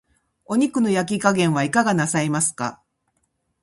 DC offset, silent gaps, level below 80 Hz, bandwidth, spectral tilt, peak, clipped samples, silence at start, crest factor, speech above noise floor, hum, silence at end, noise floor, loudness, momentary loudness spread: under 0.1%; none; -60 dBFS; 11.5 kHz; -4.5 dB/octave; -2 dBFS; under 0.1%; 0.5 s; 20 dB; 51 dB; none; 0.9 s; -71 dBFS; -20 LUFS; 5 LU